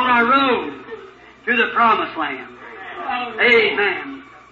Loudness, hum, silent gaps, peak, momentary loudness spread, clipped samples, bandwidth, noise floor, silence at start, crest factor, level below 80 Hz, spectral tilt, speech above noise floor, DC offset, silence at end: -17 LUFS; none; none; -2 dBFS; 21 LU; under 0.1%; 7.2 kHz; -42 dBFS; 0 s; 16 dB; -58 dBFS; -5 dB/octave; 23 dB; under 0.1%; 0.15 s